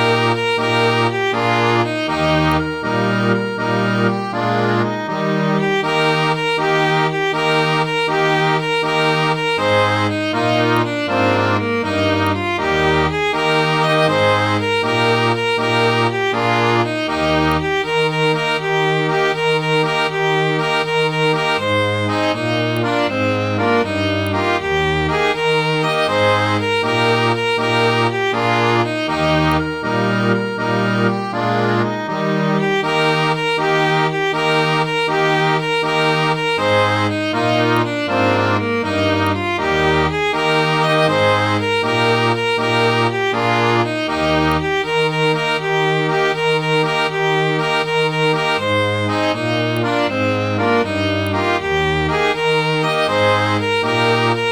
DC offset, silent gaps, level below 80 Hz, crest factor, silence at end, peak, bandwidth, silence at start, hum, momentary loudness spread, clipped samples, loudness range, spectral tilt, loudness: under 0.1%; none; -42 dBFS; 14 dB; 0 s; -2 dBFS; over 20 kHz; 0 s; none; 3 LU; under 0.1%; 2 LU; -5.5 dB/octave; -16 LUFS